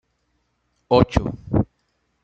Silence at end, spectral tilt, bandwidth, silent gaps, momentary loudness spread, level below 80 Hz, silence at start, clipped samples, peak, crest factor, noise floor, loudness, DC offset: 0.6 s; -8 dB/octave; 8.4 kHz; none; 7 LU; -36 dBFS; 0.9 s; under 0.1%; 0 dBFS; 22 dB; -70 dBFS; -21 LUFS; under 0.1%